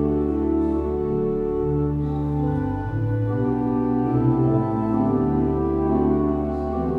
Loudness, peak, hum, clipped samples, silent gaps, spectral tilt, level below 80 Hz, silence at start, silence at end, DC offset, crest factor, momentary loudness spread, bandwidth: -22 LUFS; -8 dBFS; none; under 0.1%; none; -11.5 dB/octave; -36 dBFS; 0 s; 0 s; under 0.1%; 14 dB; 4 LU; 4.7 kHz